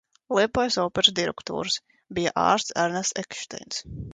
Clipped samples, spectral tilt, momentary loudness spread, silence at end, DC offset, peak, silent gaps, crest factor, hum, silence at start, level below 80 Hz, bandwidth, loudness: under 0.1%; -2.5 dB/octave; 13 LU; 0 s; under 0.1%; -4 dBFS; none; 22 dB; none; 0.3 s; -54 dBFS; 9.6 kHz; -25 LUFS